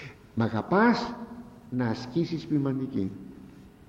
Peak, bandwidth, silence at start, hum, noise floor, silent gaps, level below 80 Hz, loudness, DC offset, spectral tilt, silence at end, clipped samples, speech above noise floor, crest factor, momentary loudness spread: -12 dBFS; 7.8 kHz; 0 s; none; -49 dBFS; none; -60 dBFS; -28 LUFS; under 0.1%; -7.5 dB/octave; 0.2 s; under 0.1%; 22 dB; 18 dB; 21 LU